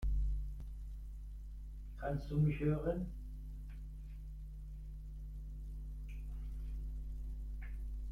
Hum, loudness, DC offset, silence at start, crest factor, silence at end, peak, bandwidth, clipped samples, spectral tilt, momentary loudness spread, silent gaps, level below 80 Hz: 50 Hz at -45 dBFS; -44 LUFS; under 0.1%; 0 s; 16 dB; 0 s; -24 dBFS; 5 kHz; under 0.1%; -9.5 dB/octave; 15 LU; none; -44 dBFS